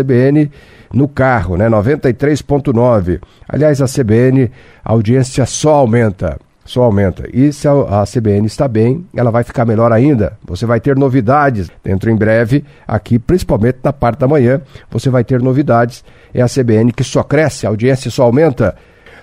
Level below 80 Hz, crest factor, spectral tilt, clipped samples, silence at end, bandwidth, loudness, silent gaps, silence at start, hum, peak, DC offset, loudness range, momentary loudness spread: -34 dBFS; 12 dB; -7.5 dB/octave; under 0.1%; 0.5 s; 13 kHz; -12 LUFS; none; 0 s; none; 0 dBFS; under 0.1%; 1 LU; 8 LU